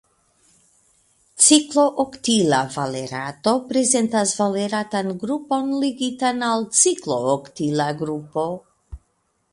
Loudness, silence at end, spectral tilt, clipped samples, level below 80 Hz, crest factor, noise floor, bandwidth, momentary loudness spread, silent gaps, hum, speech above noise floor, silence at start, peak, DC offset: -20 LUFS; 0.55 s; -3 dB/octave; under 0.1%; -54 dBFS; 20 dB; -68 dBFS; 11.5 kHz; 11 LU; none; none; 48 dB; 1.35 s; 0 dBFS; under 0.1%